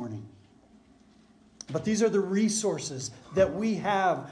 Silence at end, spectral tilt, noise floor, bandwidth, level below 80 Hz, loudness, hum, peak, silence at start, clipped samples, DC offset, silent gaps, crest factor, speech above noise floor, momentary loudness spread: 0 s; -4.5 dB/octave; -59 dBFS; 10.5 kHz; -60 dBFS; -28 LUFS; none; -12 dBFS; 0 s; under 0.1%; under 0.1%; none; 18 dB; 32 dB; 13 LU